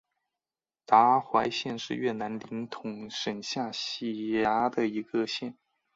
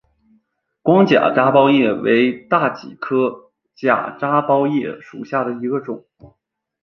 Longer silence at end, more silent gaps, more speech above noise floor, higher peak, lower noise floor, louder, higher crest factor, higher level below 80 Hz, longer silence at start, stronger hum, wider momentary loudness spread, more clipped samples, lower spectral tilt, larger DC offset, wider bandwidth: second, 0.45 s vs 0.6 s; neither; first, over 61 dB vs 48 dB; second, -6 dBFS vs -2 dBFS; first, under -90 dBFS vs -64 dBFS; second, -29 LUFS vs -17 LUFS; first, 24 dB vs 16 dB; second, -68 dBFS vs -62 dBFS; about the same, 0.9 s vs 0.85 s; neither; about the same, 14 LU vs 12 LU; neither; second, -4.5 dB/octave vs -8 dB/octave; neither; first, 7.8 kHz vs 6.4 kHz